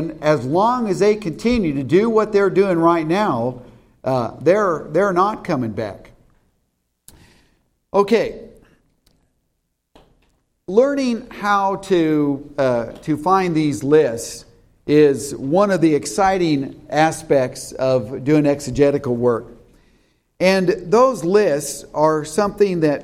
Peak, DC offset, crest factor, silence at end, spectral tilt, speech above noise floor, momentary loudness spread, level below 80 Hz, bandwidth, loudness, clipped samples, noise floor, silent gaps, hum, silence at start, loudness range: -2 dBFS; under 0.1%; 16 dB; 0 s; -6 dB/octave; 54 dB; 8 LU; -48 dBFS; 15 kHz; -18 LUFS; under 0.1%; -71 dBFS; none; none; 0 s; 7 LU